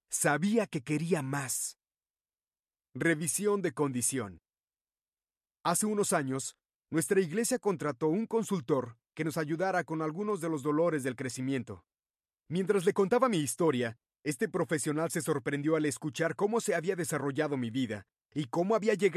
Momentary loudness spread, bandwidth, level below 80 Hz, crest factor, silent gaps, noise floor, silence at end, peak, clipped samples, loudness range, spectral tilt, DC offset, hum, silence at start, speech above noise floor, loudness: 9 LU; 14.5 kHz; -72 dBFS; 18 dB; 2.10-2.14 s, 4.63-4.68 s, 4.81-4.85 s, 6.76-6.80 s, 12.10-12.14 s; under -90 dBFS; 0 s; -14 dBFS; under 0.1%; 3 LU; -5 dB/octave; under 0.1%; none; 0.1 s; over 59 dB; -31 LUFS